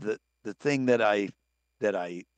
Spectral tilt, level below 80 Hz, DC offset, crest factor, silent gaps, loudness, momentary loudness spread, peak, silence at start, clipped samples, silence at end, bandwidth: -5.5 dB/octave; -76 dBFS; under 0.1%; 18 dB; none; -28 LUFS; 13 LU; -10 dBFS; 0 s; under 0.1%; 0.15 s; 9 kHz